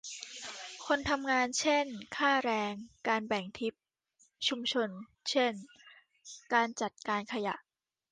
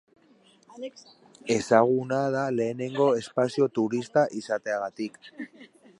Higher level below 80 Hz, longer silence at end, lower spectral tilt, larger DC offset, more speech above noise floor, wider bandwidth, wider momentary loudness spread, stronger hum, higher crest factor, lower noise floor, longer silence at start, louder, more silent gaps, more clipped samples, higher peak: first, -66 dBFS vs -72 dBFS; first, 0.55 s vs 0.35 s; second, -2.5 dB/octave vs -5.5 dB/octave; neither; first, 38 dB vs 33 dB; second, 10 kHz vs 11.5 kHz; second, 13 LU vs 20 LU; neither; about the same, 20 dB vs 22 dB; first, -71 dBFS vs -60 dBFS; second, 0.05 s vs 0.7 s; second, -33 LUFS vs -26 LUFS; neither; neither; second, -14 dBFS vs -4 dBFS